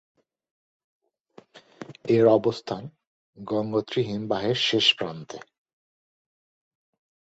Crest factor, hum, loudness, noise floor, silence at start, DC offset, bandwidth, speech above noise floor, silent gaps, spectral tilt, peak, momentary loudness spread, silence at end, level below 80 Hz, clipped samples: 22 dB; none; -24 LUFS; -55 dBFS; 1.8 s; under 0.1%; 8 kHz; 31 dB; 3.07-3.33 s; -5 dB/octave; -6 dBFS; 24 LU; 1.95 s; -66 dBFS; under 0.1%